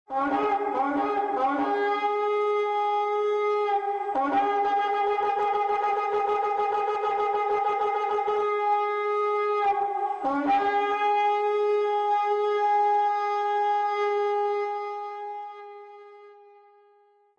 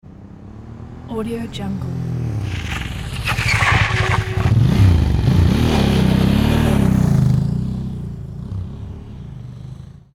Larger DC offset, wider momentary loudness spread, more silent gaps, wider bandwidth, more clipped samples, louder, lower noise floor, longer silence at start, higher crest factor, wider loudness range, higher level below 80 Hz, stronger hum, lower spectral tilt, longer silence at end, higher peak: neither; second, 4 LU vs 20 LU; neither; second, 7 kHz vs 15.5 kHz; neither; second, -25 LUFS vs -17 LUFS; first, -61 dBFS vs -37 dBFS; about the same, 0.1 s vs 0.05 s; about the same, 10 dB vs 14 dB; second, 3 LU vs 8 LU; second, -70 dBFS vs -26 dBFS; neither; second, -4.5 dB/octave vs -6.5 dB/octave; first, 1.05 s vs 0.15 s; second, -16 dBFS vs -4 dBFS